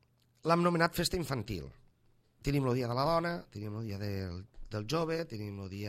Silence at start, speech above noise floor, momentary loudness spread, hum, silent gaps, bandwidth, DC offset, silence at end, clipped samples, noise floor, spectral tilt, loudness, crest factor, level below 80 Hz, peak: 0.45 s; 35 dB; 13 LU; none; none; 16 kHz; under 0.1%; 0 s; under 0.1%; -68 dBFS; -5.5 dB/octave; -34 LUFS; 22 dB; -54 dBFS; -12 dBFS